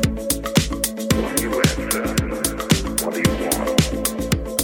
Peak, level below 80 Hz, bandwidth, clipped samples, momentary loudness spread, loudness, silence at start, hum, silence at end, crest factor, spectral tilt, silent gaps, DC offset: -2 dBFS; -32 dBFS; 17 kHz; under 0.1%; 4 LU; -21 LUFS; 0 s; none; 0 s; 20 dB; -4 dB/octave; none; under 0.1%